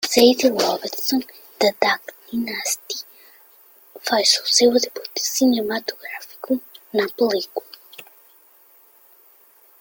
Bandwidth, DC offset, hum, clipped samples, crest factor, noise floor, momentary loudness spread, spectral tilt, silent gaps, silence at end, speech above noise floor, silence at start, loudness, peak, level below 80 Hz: 17 kHz; under 0.1%; none; under 0.1%; 22 dB; -53 dBFS; 18 LU; -1.5 dB/octave; none; 1.8 s; 33 dB; 0 s; -20 LUFS; 0 dBFS; -66 dBFS